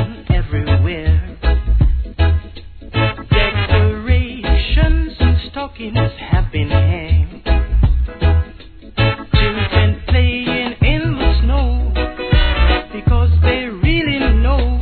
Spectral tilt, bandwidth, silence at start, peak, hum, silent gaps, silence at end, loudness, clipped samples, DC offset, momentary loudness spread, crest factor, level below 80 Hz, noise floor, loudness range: -10 dB/octave; 4.5 kHz; 0 s; 0 dBFS; none; none; 0 s; -16 LUFS; under 0.1%; 0.2%; 4 LU; 14 dB; -18 dBFS; -36 dBFS; 2 LU